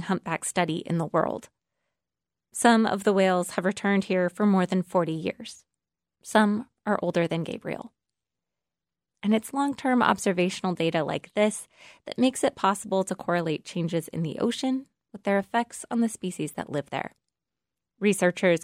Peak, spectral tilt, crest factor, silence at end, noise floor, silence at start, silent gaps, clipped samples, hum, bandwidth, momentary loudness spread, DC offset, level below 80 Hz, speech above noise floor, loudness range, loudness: -6 dBFS; -5 dB/octave; 20 dB; 0 s; -90 dBFS; 0 s; none; under 0.1%; none; 16 kHz; 11 LU; under 0.1%; -70 dBFS; 64 dB; 5 LU; -26 LUFS